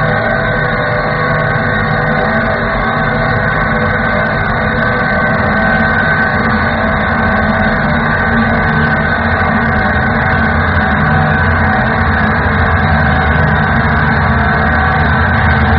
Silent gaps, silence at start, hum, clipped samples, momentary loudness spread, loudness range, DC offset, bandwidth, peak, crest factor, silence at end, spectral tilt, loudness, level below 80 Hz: none; 0 s; none; under 0.1%; 2 LU; 2 LU; under 0.1%; 5.6 kHz; -2 dBFS; 10 dB; 0 s; -5 dB/octave; -11 LUFS; -22 dBFS